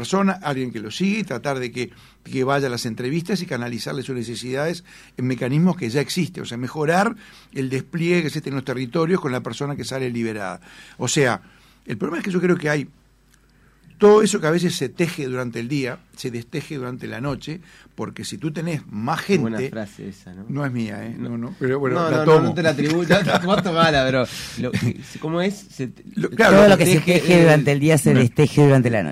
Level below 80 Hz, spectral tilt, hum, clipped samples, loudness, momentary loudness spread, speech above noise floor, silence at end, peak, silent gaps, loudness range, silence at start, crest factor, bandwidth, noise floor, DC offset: -52 dBFS; -5.5 dB/octave; none; under 0.1%; -20 LUFS; 16 LU; 36 dB; 0 s; -4 dBFS; none; 10 LU; 0 s; 16 dB; 16 kHz; -56 dBFS; under 0.1%